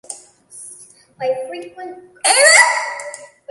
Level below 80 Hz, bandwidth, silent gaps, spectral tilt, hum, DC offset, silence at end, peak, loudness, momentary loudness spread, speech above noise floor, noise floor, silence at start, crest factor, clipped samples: -72 dBFS; 16 kHz; none; 1.5 dB/octave; none; under 0.1%; 0.25 s; 0 dBFS; -13 LUFS; 27 LU; 27 dB; -43 dBFS; 0.1 s; 18 dB; under 0.1%